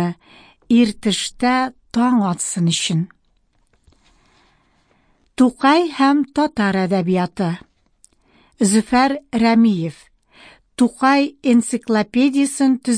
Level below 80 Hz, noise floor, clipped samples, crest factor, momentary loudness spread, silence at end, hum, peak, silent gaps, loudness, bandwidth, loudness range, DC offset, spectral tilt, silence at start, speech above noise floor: -54 dBFS; -61 dBFS; under 0.1%; 16 dB; 9 LU; 0 s; none; -4 dBFS; none; -17 LUFS; 10.5 kHz; 4 LU; under 0.1%; -5 dB/octave; 0 s; 44 dB